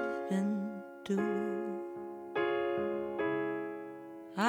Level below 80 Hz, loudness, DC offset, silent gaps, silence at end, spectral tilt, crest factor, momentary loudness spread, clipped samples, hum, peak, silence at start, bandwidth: -78 dBFS; -36 LUFS; under 0.1%; none; 0 s; -6.5 dB/octave; 20 dB; 11 LU; under 0.1%; none; -16 dBFS; 0 s; 16 kHz